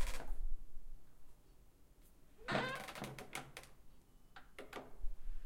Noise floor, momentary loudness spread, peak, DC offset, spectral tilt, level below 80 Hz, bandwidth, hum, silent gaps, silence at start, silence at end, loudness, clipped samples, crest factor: -63 dBFS; 28 LU; -24 dBFS; under 0.1%; -4 dB/octave; -48 dBFS; 15.5 kHz; none; none; 0 s; 0 s; -47 LUFS; under 0.1%; 18 dB